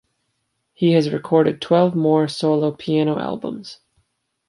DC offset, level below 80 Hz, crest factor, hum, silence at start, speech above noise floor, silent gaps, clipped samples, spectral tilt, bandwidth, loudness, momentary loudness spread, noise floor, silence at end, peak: under 0.1%; -64 dBFS; 18 dB; none; 0.8 s; 54 dB; none; under 0.1%; -7.5 dB/octave; 11.5 kHz; -19 LUFS; 11 LU; -72 dBFS; 0.75 s; -2 dBFS